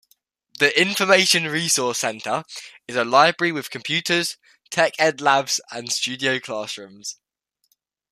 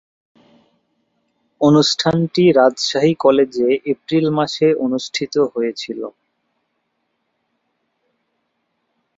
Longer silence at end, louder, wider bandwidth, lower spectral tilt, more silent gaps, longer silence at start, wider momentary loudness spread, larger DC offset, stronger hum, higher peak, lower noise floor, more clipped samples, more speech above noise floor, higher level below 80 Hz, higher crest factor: second, 1 s vs 3.1 s; second, -20 LUFS vs -16 LUFS; first, 15.5 kHz vs 7.8 kHz; second, -2 dB/octave vs -5.5 dB/octave; neither; second, 0.6 s vs 1.6 s; first, 16 LU vs 10 LU; neither; neither; about the same, -2 dBFS vs -2 dBFS; about the same, -69 dBFS vs -71 dBFS; neither; second, 47 dB vs 55 dB; second, -70 dBFS vs -60 dBFS; about the same, 20 dB vs 18 dB